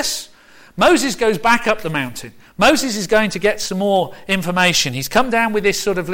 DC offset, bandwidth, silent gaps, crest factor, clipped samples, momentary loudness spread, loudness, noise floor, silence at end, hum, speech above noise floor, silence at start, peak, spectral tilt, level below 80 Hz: under 0.1%; 17 kHz; none; 14 dB; under 0.1%; 9 LU; -16 LUFS; -46 dBFS; 0 s; none; 29 dB; 0 s; -4 dBFS; -3.5 dB/octave; -42 dBFS